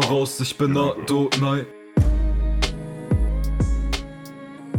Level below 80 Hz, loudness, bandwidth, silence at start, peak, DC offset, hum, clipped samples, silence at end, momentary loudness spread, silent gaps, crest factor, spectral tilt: -26 dBFS; -23 LUFS; 15.5 kHz; 0 s; -4 dBFS; under 0.1%; none; under 0.1%; 0 s; 12 LU; none; 16 dB; -5.5 dB/octave